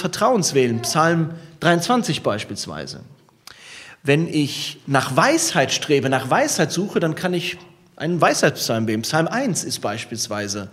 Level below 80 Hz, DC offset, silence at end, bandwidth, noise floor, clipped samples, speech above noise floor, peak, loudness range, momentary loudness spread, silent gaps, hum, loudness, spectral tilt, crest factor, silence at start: -62 dBFS; under 0.1%; 0 s; 16 kHz; -46 dBFS; under 0.1%; 26 dB; 0 dBFS; 4 LU; 11 LU; none; none; -20 LUFS; -4 dB/octave; 20 dB; 0 s